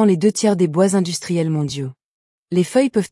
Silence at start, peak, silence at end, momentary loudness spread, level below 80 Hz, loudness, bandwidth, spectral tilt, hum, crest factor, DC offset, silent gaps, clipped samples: 0 s; -4 dBFS; 0.05 s; 8 LU; -62 dBFS; -18 LUFS; 12 kHz; -6 dB/octave; none; 14 dB; under 0.1%; 2.04-2.46 s; under 0.1%